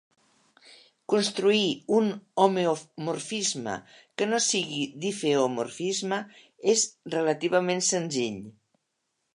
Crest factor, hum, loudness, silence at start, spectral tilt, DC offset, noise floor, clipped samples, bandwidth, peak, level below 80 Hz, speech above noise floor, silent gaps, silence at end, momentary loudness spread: 22 dB; none; -26 LUFS; 0.7 s; -3 dB/octave; under 0.1%; -79 dBFS; under 0.1%; 11.5 kHz; -6 dBFS; -76 dBFS; 52 dB; none; 0.85 s; 10 LU